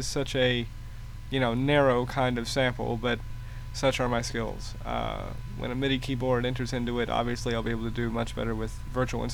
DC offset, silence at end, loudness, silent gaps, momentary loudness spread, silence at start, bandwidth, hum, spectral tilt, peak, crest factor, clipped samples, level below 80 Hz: under 0.1%; 0 s; -29 LUFS; none; 12 LU; 0 s; 19.5 kHz; none; -5.5 dB/octave; -10 dBFS; 18 dB; under 0.1%; -40 dBFS